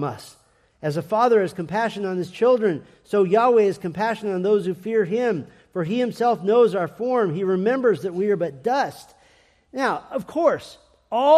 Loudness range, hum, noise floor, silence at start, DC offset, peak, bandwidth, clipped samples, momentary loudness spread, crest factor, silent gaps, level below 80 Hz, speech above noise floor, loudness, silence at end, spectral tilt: 3 LU; none; -57 dBFS; 0 s; under 0.1%; -4 dBFS; 14 kHz; under 0.1%; 11 LU; 18 dB; none; -66 dBFS; 36 dB; -22 LUFS; 0 s; -6.5 dB/octave